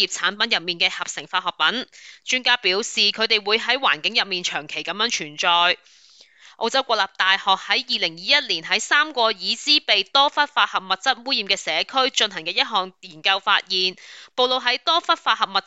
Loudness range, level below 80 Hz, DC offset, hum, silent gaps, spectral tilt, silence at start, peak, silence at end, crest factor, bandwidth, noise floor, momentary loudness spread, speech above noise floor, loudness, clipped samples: 2 LU; -72 dBFS; under 0.1%; none; none; -0.5 dB/octave; 0 s; -2 dBFS; 0.05 s; 20 dB; 9 kHz; -50 dBFS; 7 LU; 28 dB; -20 LUFS; under 0.1%